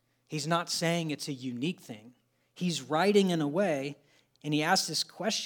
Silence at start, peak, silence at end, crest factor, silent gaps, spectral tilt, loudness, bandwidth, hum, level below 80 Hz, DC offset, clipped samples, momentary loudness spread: 0.3 s; -12 dBFS; 0 s; 20 dB; none; -4 dB/octave; -30 LUFS; 19.5 kHz; none; -86 dBFS; under 0.1%; under 0.1%; 14 LU